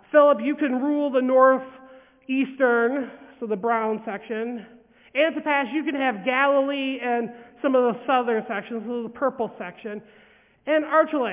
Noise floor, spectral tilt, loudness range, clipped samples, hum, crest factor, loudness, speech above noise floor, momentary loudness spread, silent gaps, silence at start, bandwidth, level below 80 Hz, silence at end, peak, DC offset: -49 dBFS; -8.5 dB/octave; 3 LU; under 0.1%; none; 18 dB; -23 LUFS; 27 dB; 15 LU; none; 0.15 s; 3.8 kHz; -72 dBFS; 0 s; -4 dBFS; under 0.1%